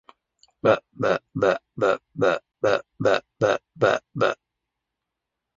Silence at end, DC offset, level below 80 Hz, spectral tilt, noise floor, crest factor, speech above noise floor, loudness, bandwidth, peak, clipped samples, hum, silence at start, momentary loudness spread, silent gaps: 1.2 s; under 0.1%; -62 dBFS; -5.5 dB/octave; -84 dBFS; 20 dB; 61 dB; -24 LUFS; 7.6 kHz; -4 dBFS; under 0.1%; none; 0.65 s; 3 LU; none